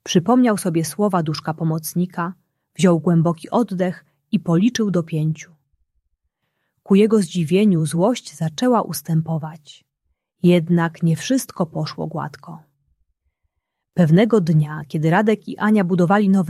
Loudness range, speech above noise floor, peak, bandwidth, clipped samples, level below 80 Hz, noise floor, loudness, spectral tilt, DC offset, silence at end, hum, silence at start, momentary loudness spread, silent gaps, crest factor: 4 LU; 57 dB; -2 dBFS; 14 kHz; under 0.1%; -62 dBFS; -75 dBFS; -19 LUFS; -6.5 dB/octave; under 0.1%; 0 s; none; 0.05 s; 11 LU; none; 16 dB